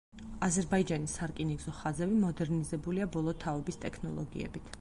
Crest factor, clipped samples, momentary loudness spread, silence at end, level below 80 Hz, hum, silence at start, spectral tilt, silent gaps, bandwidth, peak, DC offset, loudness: 16 dB; under 0.1%; 9 LU; 0 s; -52 dBFS; none; 0.15 s; -6 dB/octave; none; 11.5 kHz; -18 dBFS; under 0.1%; -34 LUFS